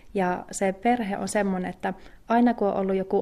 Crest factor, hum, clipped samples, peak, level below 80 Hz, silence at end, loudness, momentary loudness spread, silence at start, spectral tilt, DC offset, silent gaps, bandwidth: 14 dB; none; under 0.1%; -10 dBFS; -54 dBFS; 0 s; -26 LUFS; 9 LU; 0.05 s; -6 dB/octave; under 0.1%; none; 14 kHz